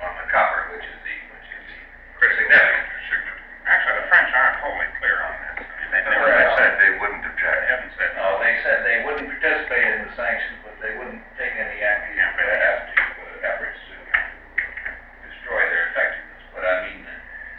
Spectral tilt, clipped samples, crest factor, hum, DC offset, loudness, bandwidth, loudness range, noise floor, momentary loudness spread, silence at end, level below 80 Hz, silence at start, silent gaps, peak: -5.5 dB/octave; under 0.1%; 18 dB; none; under 0.1%; -19 LUFS; 5.6 kHz; 6 LU; -41 dBFS; 18 LU; 0 s; -46 dBFS; 0 s; none; -2 dBFS